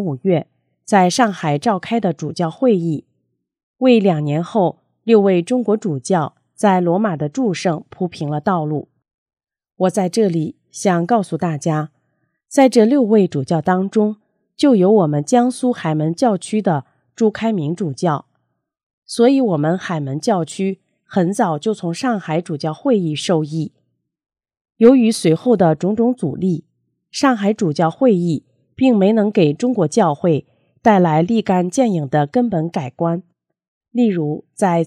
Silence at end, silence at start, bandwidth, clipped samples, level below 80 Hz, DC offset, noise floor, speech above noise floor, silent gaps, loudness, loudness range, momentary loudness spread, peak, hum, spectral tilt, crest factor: 0 s; 0 s; 13 kHz; under 0.1%; -64 dBFS; under 0.1%; -71 dBFS; 55 dB; 3.63-3.74 s, 9.14-9.26 s, 18.83-19.02 s, 24.61-24.65 s, 33.68-33.81 s; -17 LUFS; 4 LU; 10 LU; 0 dBFS; none; -6.5 dB/octave; 16 dB